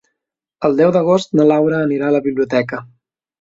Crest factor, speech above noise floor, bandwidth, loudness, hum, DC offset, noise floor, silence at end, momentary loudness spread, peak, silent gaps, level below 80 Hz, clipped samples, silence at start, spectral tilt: 14 dB; 65 dB; 7.8 kHz; -15 LUFS; none; under 0.1%; -80 dBFS; 0.55 s; 7 LU; -2 dBFS; none; -60 dBFS; under 0.1%; 0.6 s; -7 dB/octave